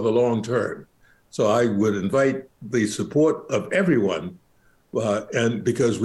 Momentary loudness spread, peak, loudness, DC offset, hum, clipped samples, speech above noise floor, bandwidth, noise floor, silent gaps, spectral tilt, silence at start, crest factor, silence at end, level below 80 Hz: 10 LU; -10 dBFS; -23 LUFS; under 0.1%; none; under 0.1%; 38 dB; 12.5 kHz; -60 dBFS; none; -6 dB/octave; 0 s; 12 dB; 0 s; -64 dBFS